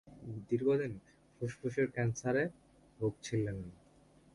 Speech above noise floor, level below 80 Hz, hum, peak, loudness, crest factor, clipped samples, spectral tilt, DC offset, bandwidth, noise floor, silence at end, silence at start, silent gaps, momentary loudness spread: 29 dB; -64 dBFS; none; -20 dBFS; -36 LUFS; 16 dB; under 0.1%; -6.5 dB/octave; under 0.1%; 11.5 kHz; -64 dBFS; 0.6 s; 0.05 s; none; 14 LU